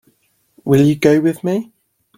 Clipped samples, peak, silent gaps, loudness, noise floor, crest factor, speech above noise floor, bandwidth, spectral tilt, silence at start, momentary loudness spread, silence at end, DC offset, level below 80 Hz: under 0.1%; 0 dBFS; none; -15 LUFS; -60 dBFS; 16 dB; 47 dB; 16 kHz; -7.5 dB/octave; 0.65 s; 11 LU; 0.55 s; under 0.1%; -54 dBFS